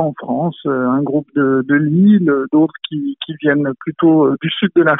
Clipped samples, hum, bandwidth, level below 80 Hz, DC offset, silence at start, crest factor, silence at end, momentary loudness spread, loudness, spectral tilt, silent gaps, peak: under 0.1%; none; 4 kHz; -60 dBFS; under 0.1%; 0 s; 14 dB; 0 s; 9 LU; -15 LUFS; -5.5 dB/octave; none; 0 dBFS